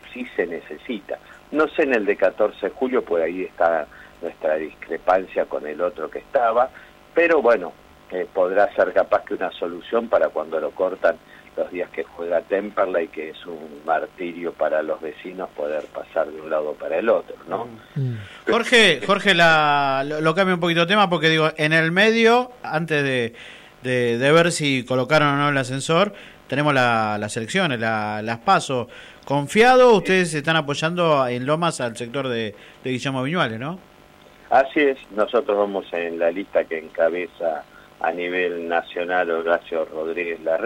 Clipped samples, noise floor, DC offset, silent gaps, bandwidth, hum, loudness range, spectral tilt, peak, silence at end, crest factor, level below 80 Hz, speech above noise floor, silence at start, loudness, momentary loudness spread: under 0.1%; -49 dBFS; under 0.1%; none; 15 kHz; none; 7 LU; -5 dB/octave; -6 dBFS; 0 s; 16 dB; -58 dBFS; 28 dB; 0.05 s; -21 LUFS; 14 LU